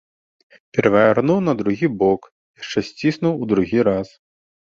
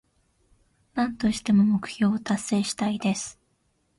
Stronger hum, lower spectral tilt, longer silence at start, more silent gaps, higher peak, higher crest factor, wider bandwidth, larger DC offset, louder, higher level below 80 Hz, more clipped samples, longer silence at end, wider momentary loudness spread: neither; first, -7 dB/octave vs -5 dB/octave; second, 0.75 s vs 0.95 s; first, 2.32-2.54 s vs none; first, -2 dBFS vs -12 dBFS; about the same, 18 dB vs 16 dB; second, 7.6 kHz vs 11.5 kHz; neither; first, -19 LUFS vs -25 LUFS; about the same, -52 dBFS vs -56 dBFS; neither; about the same, 0.6 s vs 0.65 s; about the same, 10 LU vs 9 LU